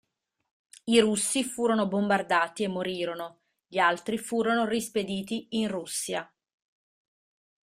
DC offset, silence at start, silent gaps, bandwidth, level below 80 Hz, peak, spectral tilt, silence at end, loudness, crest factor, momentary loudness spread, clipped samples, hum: under 0.1%; 0.85 s; none; 15.5 kHz; -68 dBFS; -8 dBFS; -3.5 dB/octave; 1.4 s; -27 LUFS; 22 dB; 9 LU; under 0.1%; none